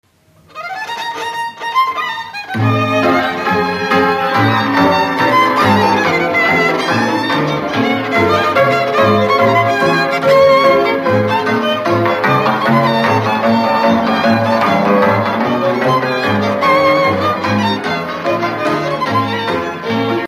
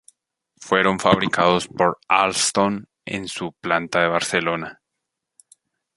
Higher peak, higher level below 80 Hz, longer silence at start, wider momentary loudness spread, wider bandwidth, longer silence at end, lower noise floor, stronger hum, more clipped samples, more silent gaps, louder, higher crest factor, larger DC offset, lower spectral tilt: about the same, 0 dBFS vs -2 dBFS; about the same, -52 dBFS vs -56 dBFS; about the same, 0.55 s vs 0.6 s; second, 7 LU vs 12 LU; first, 15 kHz vs 11.5 kHz; second, 0 s vs 1.25 s; second, -48 dBFS vs -81 dBFS; neither; neither; neither; first, -13 LUFS vs -20 LUFS; second, 12 dB vs 20 dB; neither; first, -6 dB/octave vs -3.5 dB/octave